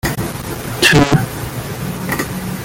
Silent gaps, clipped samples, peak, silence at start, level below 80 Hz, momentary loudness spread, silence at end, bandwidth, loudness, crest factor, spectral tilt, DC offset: none; under 0.1%; 0 dBFS; 0.05 s; -34 dBFS; 14 LU; 0 s; 17 kHz; -16 LUFS; 16 dB; -4.5 dB/octave; under 0.1%